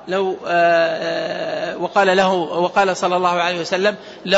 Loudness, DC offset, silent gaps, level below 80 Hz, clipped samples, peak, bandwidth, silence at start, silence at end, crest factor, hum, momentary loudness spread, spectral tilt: -18 LUFS; under 0.1%; none; -62 dBFS; under 0.1%; -4 dBFS; 8 kHz; 0 s; 0 s; 14 dB; none; 9 LU; -4.5 dB/octave